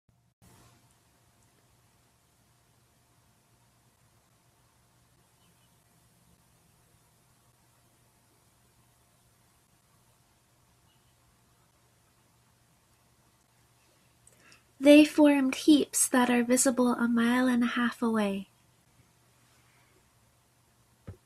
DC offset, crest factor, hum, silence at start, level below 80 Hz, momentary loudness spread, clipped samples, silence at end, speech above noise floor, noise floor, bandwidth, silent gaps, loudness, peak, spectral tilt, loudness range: under 0.1%; 24 dB; none; 14.8 s; -72 dBFS; 10 LU; under 0.1%; 0.15 s; 43 dB; -67 dBFS; 15 kHz; none; -24 LUFS; -8 dBFS; -3 dB/octave; 11 LU